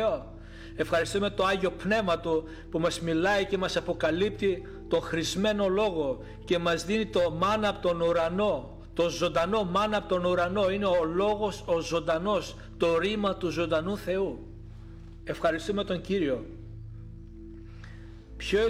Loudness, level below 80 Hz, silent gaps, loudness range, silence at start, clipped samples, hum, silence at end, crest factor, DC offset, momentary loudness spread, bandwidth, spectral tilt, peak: -28 LUFS; -48 dBFS; none; 5 LU; 0 s; under 0.1%; none; 0 s; 16 dB; under 0.1%; 19 LU; 15.5 kHz; -5 dB/octave; -14 dBFS